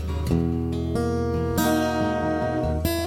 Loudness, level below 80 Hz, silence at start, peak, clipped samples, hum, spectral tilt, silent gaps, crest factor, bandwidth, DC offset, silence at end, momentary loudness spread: -24 LUFS; -34 dBFS; 0 s; -10 dBFS; under 0.1%; none; -6.5 dB/octave; none; 14 dB; 17 kHz; under 0.1%; 0 s; 3 LU